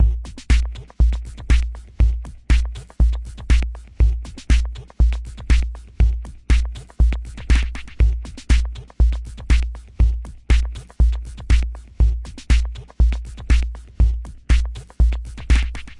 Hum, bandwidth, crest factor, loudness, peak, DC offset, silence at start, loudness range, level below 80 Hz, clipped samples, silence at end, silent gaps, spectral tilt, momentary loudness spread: none; 10 kHz; 14 dB; -22 LUFS; -4 dBFS; under 0.1%; 0 s; 0 LU; -18 dBFS; under 0.1%; 0.05 s; none; -6 dB/octave; 9 LU